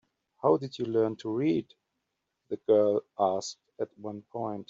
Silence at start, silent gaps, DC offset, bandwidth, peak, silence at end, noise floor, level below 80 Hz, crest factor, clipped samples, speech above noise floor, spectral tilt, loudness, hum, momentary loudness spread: 0.45 s; none; under 0.1%; 7.6 kHz; -12 dBFS; 0.05 s; -82 dBFS; -74 dBFS; 18 dB; under 0.1%; 54 dB; -6.5 dB/octave; -29 LUFS; none; 14 LU